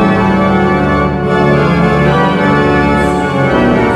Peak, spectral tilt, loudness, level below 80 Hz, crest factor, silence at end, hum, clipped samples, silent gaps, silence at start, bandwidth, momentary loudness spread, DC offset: 0 dBFS; -7.5 dB/octave; -10 LUFS; -26 dBFS; 10 dB; 0 s; none; under 0.1%; none; 0 s; 11.5 kHz; 2 LU; under 0.1%